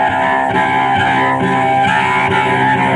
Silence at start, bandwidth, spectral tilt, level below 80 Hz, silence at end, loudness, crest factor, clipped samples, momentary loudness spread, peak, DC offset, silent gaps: 0 s; 11 kHz; -5.5 dB/octave; -48 dBFS; 0 s; -13 LUFS; 12 dB; under 0.1%; 1 LU; -2 dBFS; under 0.1%; none